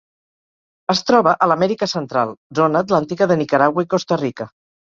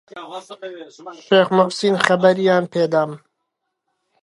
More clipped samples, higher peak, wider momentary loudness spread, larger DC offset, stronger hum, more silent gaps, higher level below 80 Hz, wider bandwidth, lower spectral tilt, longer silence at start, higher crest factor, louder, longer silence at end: neither; about the same, 0 dBFS vs 0 dBFS; second, 8 LU vs 20 LU; neither; neither; first, 2.37-2.50 s vs none; first, -60 dBFS vs -70 dBFS; second, 7.6 kHz vs 11.5 kHz; about the same, -5.5 dB/octave vs -5.5 dB/octave; first, 0.9 s vs 0.15 s; about the same, 18 dB vs 20 dB; about the same, -17 LUFS vs -17 LUFS; second, 0.4 s vs 1.05 s